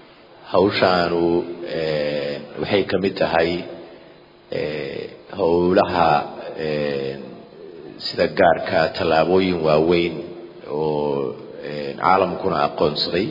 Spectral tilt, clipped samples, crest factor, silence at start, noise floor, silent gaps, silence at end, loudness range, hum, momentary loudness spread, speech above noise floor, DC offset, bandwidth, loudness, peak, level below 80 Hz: -7.5 dB/octave; under 0.1%; 20 dB; 0.4 s; -46 dBFS; none; 0 s; 4 LU; none; 16 LU; 28 dB; under 0.1%; 5.4 kHz; -20 LUFS; -2 dBFS; -54 dBFS